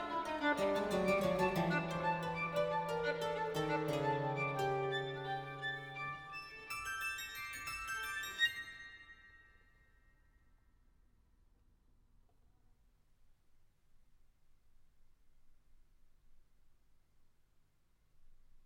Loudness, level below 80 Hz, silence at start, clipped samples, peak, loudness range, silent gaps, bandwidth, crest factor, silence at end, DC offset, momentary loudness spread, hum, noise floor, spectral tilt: -38 LUFS; -66 dBFS; 0 s; under 0.1%; -22 dBFS; 6 LU; none; 19 kHz; 20 dB; 0.05 s; under 0.1%; 11 LU; none; -72 dBFS; -5 dB/octave